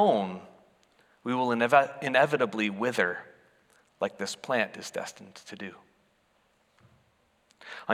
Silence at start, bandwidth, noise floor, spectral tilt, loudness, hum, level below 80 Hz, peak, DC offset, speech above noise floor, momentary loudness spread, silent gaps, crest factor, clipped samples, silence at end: 0 s; 15 kHz; -69 dBFS; -4.5 dB/octave; -28 LUFS; none; -80 dBFS; -6 dBFS; under 0.1%; 41 dB; 19 LU; none; 24 dB; under 0.1%; 0 s